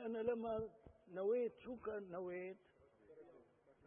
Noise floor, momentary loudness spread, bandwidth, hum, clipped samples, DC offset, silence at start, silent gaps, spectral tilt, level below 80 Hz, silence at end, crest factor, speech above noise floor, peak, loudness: -69 dBFS; 23 LU; 3.6 kHz; none; under 0.1%; under 0.1%; 0 s; none; -3.5 dB/octave; -76 dBFS; 0.15 s; 18 dB; 25 dB; -28 dBFS; -45 LUFS